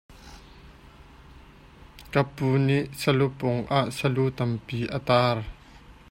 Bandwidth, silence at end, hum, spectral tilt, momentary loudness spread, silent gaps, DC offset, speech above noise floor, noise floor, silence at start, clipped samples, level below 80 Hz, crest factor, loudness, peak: 16 kHz; 0.2 s; none; -6.5 dB/octave; 8 LU; none; under 0.1%; 25 dB; -50 dBFS; 0.1 s; under 0.1%; -50 dBFS; 20 dB; -25 LUFS; -8 dBFS